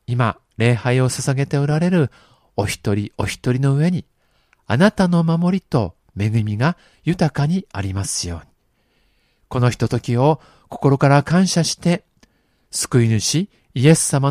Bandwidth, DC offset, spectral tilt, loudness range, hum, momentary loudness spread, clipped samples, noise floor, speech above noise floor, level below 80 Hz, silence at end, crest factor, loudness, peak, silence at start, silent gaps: 15 kHz; under 0.1%; -5.5 dB/octave; 4 LU; none; 10 LU; under 0.1%; -63 dBFS; 45 dB; -48 dBFS; 0 s; 18 dB; -19 LUFS; 0 dBFS; 0.1 s; none